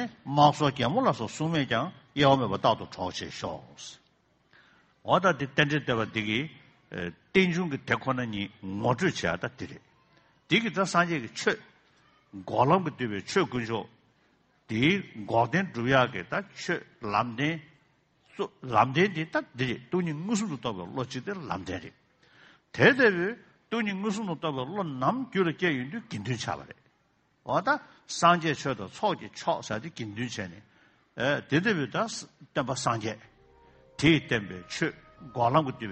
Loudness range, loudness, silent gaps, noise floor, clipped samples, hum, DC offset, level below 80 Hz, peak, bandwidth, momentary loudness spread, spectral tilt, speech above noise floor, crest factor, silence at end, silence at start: 3 LU; -28 LUFS; none; -69 dBFS; under 0.1%; none; under 0.1%; -62 dBFS; -6 dBFS; 8.4 kHz; 14 LU; -5 dB/octave; 41 dB; 24 dB; 0 s; 0 s